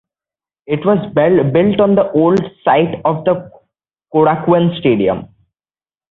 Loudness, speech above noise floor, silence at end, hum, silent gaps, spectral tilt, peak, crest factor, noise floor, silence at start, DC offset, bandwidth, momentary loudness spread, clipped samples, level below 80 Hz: -14 LUFS; over 77 dB; 0.85 s; none; none; -9.5 dB/octave; -2 dBFS; 14 dB; under -90 dBFS; 0.7 s; under 0.1%; 6.8 kHz; 6 LU; under 0.1%; -50 dBFS